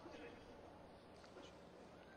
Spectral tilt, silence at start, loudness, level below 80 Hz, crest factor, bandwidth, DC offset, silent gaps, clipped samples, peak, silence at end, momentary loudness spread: -5 dB/octave; 0 s; -60 LUFS; -74 dBFS; 14 dB; 10.5 kHz; under 0.1%; none; under 0.1%; -44 dBFS; 0 s; 5 LU